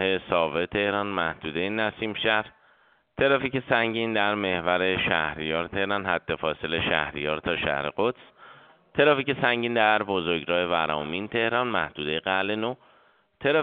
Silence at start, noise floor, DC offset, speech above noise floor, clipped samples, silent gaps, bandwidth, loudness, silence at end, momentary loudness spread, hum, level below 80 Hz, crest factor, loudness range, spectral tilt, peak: 0 s; -62 dBFS; under 0.1%; 36 dB; under 0.1%; none; 4.7 kHz; -25 LUFS; 0 s; 6 LU; none; -56 dBFS; 22 dB; 3 LU; -2 dB/octave; -4 dBFS